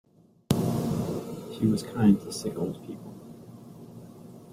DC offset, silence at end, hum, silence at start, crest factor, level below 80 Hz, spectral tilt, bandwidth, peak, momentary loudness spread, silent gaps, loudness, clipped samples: under 0.1%; 0 s; none; 0.5 s; 24 dB; -56 dBFS; -7 dB/octave; 16 kHz; -4 dBFS; 24 LU; none; -28 LUFS; under 0.1%